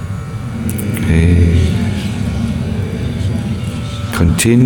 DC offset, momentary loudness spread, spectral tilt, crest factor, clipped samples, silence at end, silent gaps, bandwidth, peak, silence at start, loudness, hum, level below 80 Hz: under 0.1%; 11 LU; -6 dB/octave; 14 dB; under 0.1%; 0 s; none; 19 kHz; 0 dBFS; 0 s; -16 LUFS; none; -24 dBFS